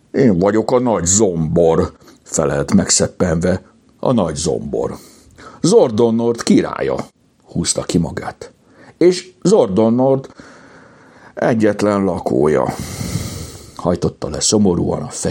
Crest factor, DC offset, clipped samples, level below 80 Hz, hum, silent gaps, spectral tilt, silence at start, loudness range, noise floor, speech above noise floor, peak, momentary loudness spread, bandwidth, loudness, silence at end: 16 dB; under 0.1%; under 0.1%; -44 dBFS; none; none; -5 dB/octave; 0.15 s; 3 LU; -44 dBFS; 29 dB; 0 dBFS; 11 LU; 17 kHz; -16 LUFS; 0 s